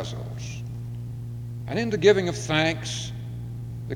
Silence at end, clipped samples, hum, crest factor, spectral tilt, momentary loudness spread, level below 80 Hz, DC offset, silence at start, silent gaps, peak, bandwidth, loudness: 0 s; under 0.1%; none; 22 dB; -5 dB/octave; 16 LU; -48 dBFS; under 0.1%; 0 s; none; -4 dBFS; 14.5 kHz; -27 LUFS